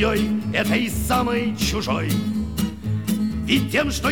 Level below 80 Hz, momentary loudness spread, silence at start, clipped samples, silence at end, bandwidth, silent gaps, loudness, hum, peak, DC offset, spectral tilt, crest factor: -34 dBFS; 5 LU; 0 s; under 0.1%; 0 s; 19.5 kHz; none; -22 LUFS; none; -4 dBFS; 0.5%; -5 dB/octave; 16 dB